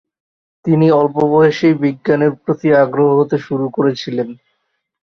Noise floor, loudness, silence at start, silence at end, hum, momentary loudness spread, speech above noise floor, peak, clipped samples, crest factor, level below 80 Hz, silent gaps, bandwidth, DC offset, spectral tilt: -70 dBFS; -14 LUFS; 0.65 s; 0.7 s; none; 9 LU; 56 dB; -2 dBFS; under 0.1%; 14 dB; -56 dBFS; none; 6.4 kHz; under 0.1%; -8 dB/octave